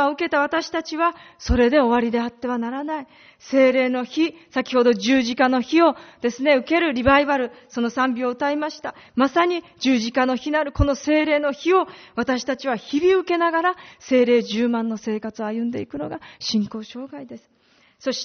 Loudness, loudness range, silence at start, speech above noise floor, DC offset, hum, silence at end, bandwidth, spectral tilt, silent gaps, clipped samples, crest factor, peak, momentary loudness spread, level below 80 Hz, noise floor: -21 LUFS; 4 LU; 0 s; 33 dB; under 0.1%; none; 0 s; 6.6 kHz; -3.5 dB/octave; none; under 0.1%; 18 dB; -2 dBFS; 12 LU; -40 dBFS; -54 dBFS